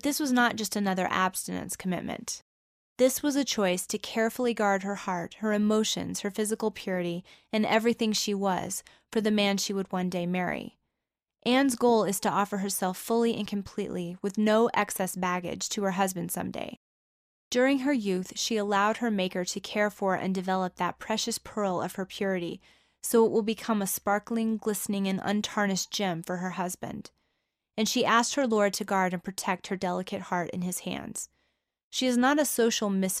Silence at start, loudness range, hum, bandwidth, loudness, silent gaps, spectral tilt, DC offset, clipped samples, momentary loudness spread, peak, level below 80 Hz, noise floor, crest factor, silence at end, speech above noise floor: 0.05 s; 2 LU; none; 15.5 kHz; -28 LUFS; 2.42-2.96 s, 16.77-17.51 s, 31.83-31.91 s; -4 dB/octave; under 0.1%; under 0.1%; 10 LU; -10 dBFS; -66 dBFS; -87 dBFS; 18 dB; 0 s; 59 dB